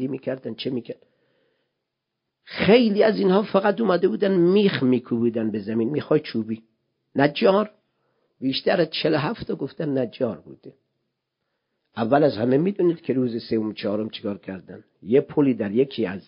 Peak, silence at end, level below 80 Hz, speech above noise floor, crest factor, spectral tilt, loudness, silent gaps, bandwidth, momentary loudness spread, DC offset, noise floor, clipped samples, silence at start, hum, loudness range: -2 dBFS; 0.1 s; -62 dBFS; 59 dB; 20 dB; -11 dB/octave; -22 LUFS; none; 5.4 kHz; 13 LU; under 0.1%; -81 dBFS; under 0.1%; 0 s; none; 6 LU